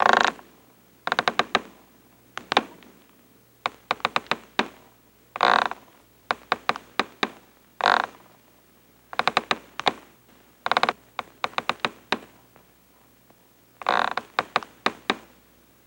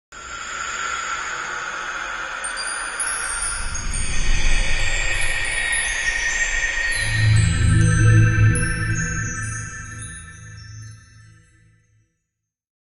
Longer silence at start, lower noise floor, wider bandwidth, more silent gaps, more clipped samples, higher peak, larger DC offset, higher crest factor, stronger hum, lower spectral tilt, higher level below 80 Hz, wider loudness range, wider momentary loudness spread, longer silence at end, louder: about the same, 0 s vs 0.1 s; second, -57 dBFS vs -80 dBFS; first, 16.5 kHz vs 11.5 kHz; neither; neither; about the same, -2 dBFS vs -4 dBFS; neither; first, 26 dB vs 16 dB; neither; about the same, -2.5 dB/octave vs -3.5 dB/octave; second, -66 dBFS vs -28 dBFS; second, 3 LU vs 12 LU; about the same, 14 LU vs 16 LU; second, 0.65 s vs 2 s; second, -26 LUFS vs -21 LUFS